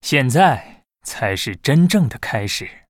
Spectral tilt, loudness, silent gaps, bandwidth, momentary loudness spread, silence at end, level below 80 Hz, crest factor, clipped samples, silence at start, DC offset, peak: -5 dB/octave; -17 LUFS; none; 16.5 kHz; 11 LU; 0.2 s; -50 dBFS; 18 dB; under 0.1%; 0.05 s; under 0.1%; 0 dBFS